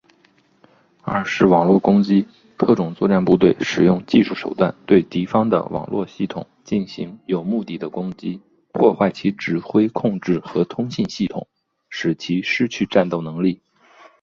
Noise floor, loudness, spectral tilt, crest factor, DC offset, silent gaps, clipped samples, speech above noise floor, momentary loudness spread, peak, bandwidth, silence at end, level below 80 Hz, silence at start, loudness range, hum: -58 dBFS; -19 LUFS; -7 dB/octave; 18 dB; under 0.1%; none; under 0.1%; 39 dB; 13 LU; 0 dBFS; 7.2 kHz; 0.65 s; -54 dBFS; 1.05 s; 6 LU; none